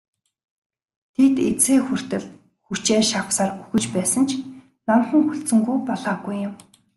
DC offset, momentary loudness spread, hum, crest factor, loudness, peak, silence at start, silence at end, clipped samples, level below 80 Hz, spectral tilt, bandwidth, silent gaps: under 0.1%; 12 LU; none; 16 dB; -21 LUFS; -6 dBFS; 1.2 s; 0.4 s; under 0.1%; -60 dBFS; -4 dB/octave; 12.5 kHz; none